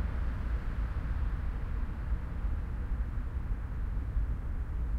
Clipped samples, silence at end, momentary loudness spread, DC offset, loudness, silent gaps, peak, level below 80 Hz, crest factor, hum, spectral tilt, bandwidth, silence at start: under 0.1%; 0 s; 2 LU; under 0.1%; -37 LUFS; none; -20 dBFS; -34 dBFS; 12 dB; none; -8.5 dB/octave; 4.8 kHz; 0 s